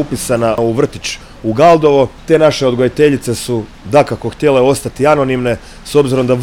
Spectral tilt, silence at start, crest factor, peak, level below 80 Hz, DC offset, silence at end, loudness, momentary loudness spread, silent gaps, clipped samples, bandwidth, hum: -5.5 dB/octave; 0 s; 12 dB; 0 dBFS; -38 dBFS; under 0.1%; 0 s; -13 LUFS; 10 LU; none; under 0.1%; 16.5 kHz; none